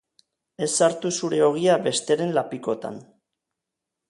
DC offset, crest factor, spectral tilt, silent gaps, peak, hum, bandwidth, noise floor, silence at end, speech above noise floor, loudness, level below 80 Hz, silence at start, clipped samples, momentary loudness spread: under 0.1%; 18 dB; -4 dB/octave; none; -6 dBFS; none; 11.5 kHz; -85 dBFS; 1.1 s; 62 dB; -23 LUFS; -72 dBFS; 0.6 s; under 0.1%; 10 LU